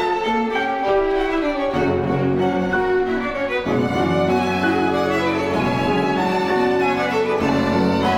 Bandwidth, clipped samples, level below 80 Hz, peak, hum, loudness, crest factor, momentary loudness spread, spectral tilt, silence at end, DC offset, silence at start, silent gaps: 15 kHz; under 0.1%; -42 dBFS; -6 dBFS; none; -19 LUFS; 12 dB; 2 LU; -6.5 dB/octave; 0 s; under 0.1%; 0 s; none